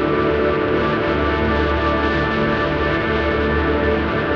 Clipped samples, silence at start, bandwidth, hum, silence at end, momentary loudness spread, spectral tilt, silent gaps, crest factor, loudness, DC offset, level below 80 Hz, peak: under 0.1%; 0 s; 6.8 kHz; none; 0 s; 1 LU; -8 dB/octave; none; 14 dB; -18 LUFS; under 0.1%; -28 dBFS; -4 dBFS